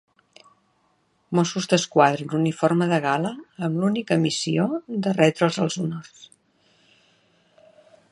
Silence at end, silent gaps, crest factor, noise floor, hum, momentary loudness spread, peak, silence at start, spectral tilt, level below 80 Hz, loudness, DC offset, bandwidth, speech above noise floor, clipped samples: 1.85 s; none; 22 dB; -66 dBFS; none; 9 LU; -2 dBFS; 1.3 s; -5.5 dB/octave; -68 dBFS; -22 LUFS; under 0.1%; 11.5 kHz; 44 dB; under 0.1%